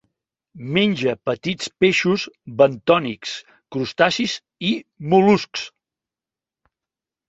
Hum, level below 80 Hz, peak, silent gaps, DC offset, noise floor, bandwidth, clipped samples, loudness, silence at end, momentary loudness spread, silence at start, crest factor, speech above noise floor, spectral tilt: none; -60 dBFS; -2 dBFS; none; under 0.1%; -90 dBFS; 8 kHz; under 0.1%; -20 LUFS; 1.6 s; 14 LU; 0.55 s; 20 dB; 70 dB; -5 dB/octave